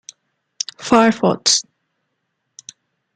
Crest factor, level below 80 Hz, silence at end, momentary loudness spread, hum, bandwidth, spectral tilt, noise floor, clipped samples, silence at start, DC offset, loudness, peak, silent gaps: 20 dB; -60 dBFS; 1.55 s; 14 LU; none; 9.4 kHz; -3 dB/octave; -73 dBFS; under 0.1%; 0.8 s; under 0.1%; -16 LUFS; -2 dBFS; none